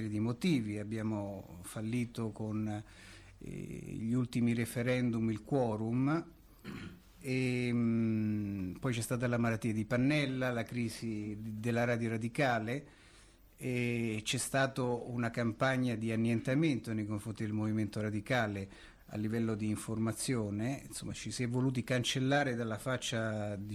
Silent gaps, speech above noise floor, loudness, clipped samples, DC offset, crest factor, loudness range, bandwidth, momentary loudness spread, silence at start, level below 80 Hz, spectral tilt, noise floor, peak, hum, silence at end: none; 26 dB; -35 LUFS; under 0.1%; under 0.1%; 16 dB; 4 LU; 15 kHz; 12 LU; 0 s; -62 dBFS; -5.5 dB/octave; -60 dBFS; -20 dBFS; none; 0 s